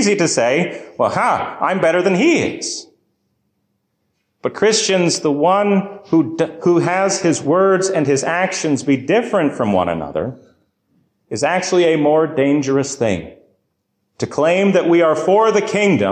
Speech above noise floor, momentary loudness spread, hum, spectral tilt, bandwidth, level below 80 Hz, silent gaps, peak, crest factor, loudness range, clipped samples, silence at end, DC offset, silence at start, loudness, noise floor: 54 dB; 8 LU; none; -4.5 dB/octave; 10 kHz; -52 dBFS; none; -4 dBFS; 14 dB; 3 LU; under 0.1%; 0 s; under 0.1%; 0 s; -16 LUFS; -70 dBFS